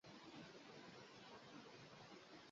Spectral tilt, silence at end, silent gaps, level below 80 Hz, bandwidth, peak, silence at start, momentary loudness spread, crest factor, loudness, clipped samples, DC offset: -3 dB/octave; 0 s; none; -88 dBFS; 7.4 kHz; -48 dBFS; 0.05 s; 2 LU; 14 dB; -60 LUFS; under 0.1%; under 0.1%